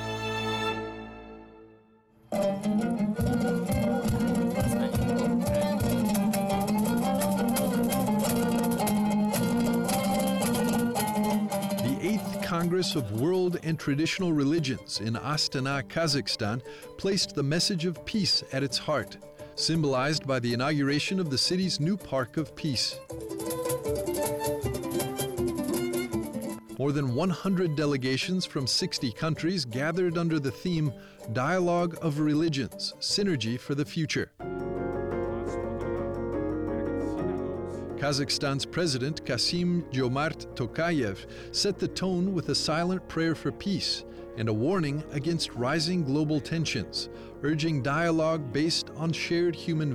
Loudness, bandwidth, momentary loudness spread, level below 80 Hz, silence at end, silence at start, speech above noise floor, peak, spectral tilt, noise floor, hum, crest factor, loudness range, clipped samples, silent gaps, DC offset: -28 LUFS; 16 kHz; 7 LU; -50 dBFS; 0 s; 0 s; 31 dB; -18 dBFS; -5 dB/octave; -59 dBFS; none; 10 dB; 4 LU; under 0.1%; none; under 0.1%